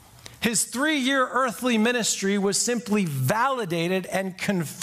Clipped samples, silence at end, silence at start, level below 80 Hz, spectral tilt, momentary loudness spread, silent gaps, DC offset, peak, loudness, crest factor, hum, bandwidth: under 0.1%; 0 s; 0.25 s; -62 dBFS; -3.5 dB/octave; 5 LU; none; under 0.1%; -4 dBFS; -24 LUFS; 20 dB; none; 15.5 kHz